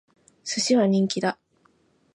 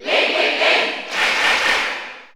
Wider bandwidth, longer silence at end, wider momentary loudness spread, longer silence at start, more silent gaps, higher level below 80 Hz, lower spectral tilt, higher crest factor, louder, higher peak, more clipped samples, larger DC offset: second, 11 kHz vs over 20 kHz; first, 0.8 s vs 0.1 s; first, 17 LU vs 7 LU; first, 0.45 s vs 0 s; neither; second, -74 dBFS vs -56 dBFS; first, -4.5 dB/octave vs -0.5 dB/octave; about the same, 16 dB vs 16 dB; second, -23 LUFS vs -16 LUFS; second, -10 dBFS vs -4 dBFS; neither; neither